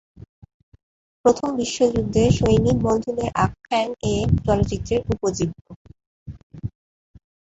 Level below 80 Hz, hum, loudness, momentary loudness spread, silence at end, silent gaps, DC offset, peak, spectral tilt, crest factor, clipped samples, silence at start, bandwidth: -36 dBFS; none; -21 LUFS; 17 LU; 0.9 s; 5.76-5.85 s, 6.06-6.26 s, 6.43-6.50 s; under 0.1%; -4 dBFS; -6.5 dB/octave; 20 dB; under 0.1%; 1.25 s; 8.2 kHz